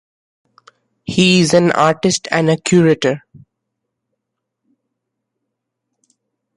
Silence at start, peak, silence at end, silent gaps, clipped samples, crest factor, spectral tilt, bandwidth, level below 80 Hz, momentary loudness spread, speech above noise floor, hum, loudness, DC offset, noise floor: 1.1 s; 0 dBFS; 3.4 s; none; under 0.1%; 18 dB; -5 dB/octave; 11.5 kHz; -54 dBFS; 9 LU; 64 dB; none; -14 LUFS; under 0.1%; -78 dBFS